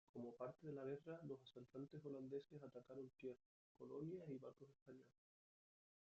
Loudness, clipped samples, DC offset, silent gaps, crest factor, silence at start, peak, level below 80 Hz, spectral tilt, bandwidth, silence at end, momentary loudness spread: -56 LUFS; under 0.1%; under 0.1%; 3.46-3.75 s, 4.82-4.86 s; 18 dB; 0.15 s; -40 dBFS; under -90 dBFS; -7.5 dB/octave; 7.4 kHz; 1.1 s; 12 LU